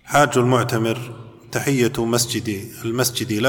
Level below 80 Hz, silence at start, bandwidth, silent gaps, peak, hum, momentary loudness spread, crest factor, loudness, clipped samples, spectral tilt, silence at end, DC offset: -52 dBFS; 0.05 s; 19 kHz; none; -2 dBFS; none; 12 LU; 18 dB; -20 LUFS; under 0.1%; -4.5 dB/octave; 0 s; under 0.1%